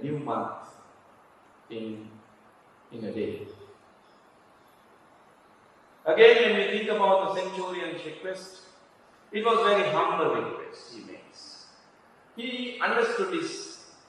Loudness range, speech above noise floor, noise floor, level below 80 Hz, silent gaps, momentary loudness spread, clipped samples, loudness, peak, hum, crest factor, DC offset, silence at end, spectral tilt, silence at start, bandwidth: 17 LU; 31 dB; -58 dBFS; -78 dBFS; none; 23 LU; under 0.1%; -26 LUFS; -4 dBFS; none; 24 dB; under 0.1%; 0.25 s; -4.5 dB/octave; 0 s; 10.5 kHz